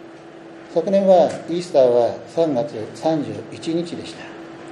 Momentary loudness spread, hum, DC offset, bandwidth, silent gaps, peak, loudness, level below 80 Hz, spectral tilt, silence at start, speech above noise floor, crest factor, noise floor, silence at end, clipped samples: 21 LU; none; under 0.1%; 11 kHz; none; -4 dBFS; -19 LUFS; -66 dBFS; -6.5 dB/octave; 0 s; 21 dB; 16 dB; -40 dBFS; 0 s; under 0.1%